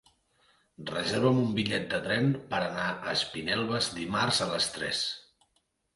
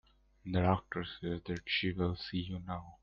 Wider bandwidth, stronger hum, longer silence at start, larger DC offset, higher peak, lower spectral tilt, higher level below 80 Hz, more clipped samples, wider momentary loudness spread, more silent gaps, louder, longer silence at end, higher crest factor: first, 11.5 kHz vs 7 kHz; neither; first, 0.8 s vs 0.45 s; neither; first, -12 dBFS vs -16 dBFS; second, -4 dB/octave vs -7.5 dB/octave; about the same, -62 dBFS vs -58 dBFS; neither; second, 6 LU vs 10 LU; neither; first, -29 LUFS vs -36 LUFS; first, 0.75 s vs 0.05 s; about the same, 20 dB vs 20 dB